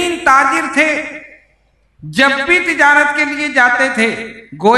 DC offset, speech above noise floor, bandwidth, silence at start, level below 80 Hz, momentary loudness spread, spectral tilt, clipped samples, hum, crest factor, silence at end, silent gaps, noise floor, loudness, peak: under 0.1%; 43 dB; 12.5 kHz; 0 s; -50 dBFS; 13 LU; -3 dB/octave; 0.1%; none; 14 dB; 0 s; none; -56 dBFS; -12 LUFS; 0 dBFS